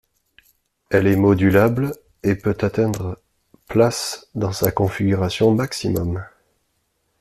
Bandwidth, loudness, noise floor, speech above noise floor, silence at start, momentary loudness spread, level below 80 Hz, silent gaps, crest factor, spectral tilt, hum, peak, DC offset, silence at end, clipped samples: 15 kHz; -20 LUFS; -69 dBFS; 51 dB; 0.9 s; 11 LU; -48 dBFS; none; 20 dB; -6 dB/octave; none; 0 dBFS; under 0.1%; 0.9 s; under 0.1%